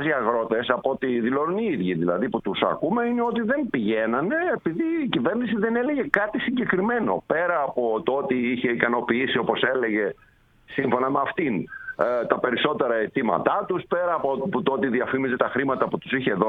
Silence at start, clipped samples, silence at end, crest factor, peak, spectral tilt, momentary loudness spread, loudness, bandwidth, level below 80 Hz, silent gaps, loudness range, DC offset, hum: 0 s; under 0.1%; 0 s; 24 dB; 0 dBFS; -8 dB/octave; 3 LU; -24 LUFS; 4.6 kHz; -60 dBFS; none; 1 LU; under 0.1%; none